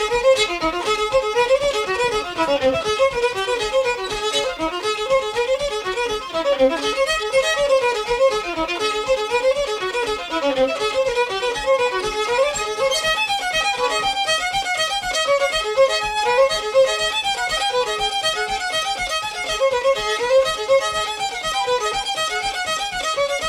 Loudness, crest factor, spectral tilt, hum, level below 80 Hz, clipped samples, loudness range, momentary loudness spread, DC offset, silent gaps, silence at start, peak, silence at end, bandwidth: -19 LUFS; 14 dB; -1.5 dB/octave; none; -44 dBFS; under 0.1%; 2 LU; 5 LU; under 0.1%; none; 0 s; -6 dBFS; 0 s; 15.5 kHz